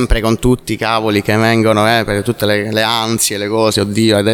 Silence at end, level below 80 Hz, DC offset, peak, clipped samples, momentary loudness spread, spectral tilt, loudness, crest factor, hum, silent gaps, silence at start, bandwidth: 0 s; -28 dBFS; under 0.1%; 0 dBFS; under 0.1%; 4 LU; -4.5 dB/octave; -13 LUFS; 14 dB; none; none; 0 s; 19 kHz